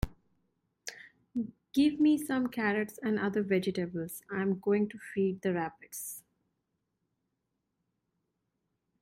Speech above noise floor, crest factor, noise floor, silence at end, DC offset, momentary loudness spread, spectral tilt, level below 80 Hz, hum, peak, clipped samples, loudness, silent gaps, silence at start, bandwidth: 52 dB; 18 dB; -83 dBFS; 2.8 s; under 0.1%; 15 LU; -6 dB/octave; -54 dBFS; none; -16 dBFS; under 0.1%; -32 LUFS; none; 0 s; 16 kHz